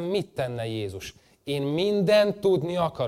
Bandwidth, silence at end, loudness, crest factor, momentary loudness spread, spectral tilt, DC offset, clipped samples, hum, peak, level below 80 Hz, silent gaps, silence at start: 15 kHz; 0 s; -25 LUFS; 16 dB; 16 LU; -6 dB/octave; under 0.1%; under 0.1%; none; -10 dBFS; -58 dBFS; none; 0 s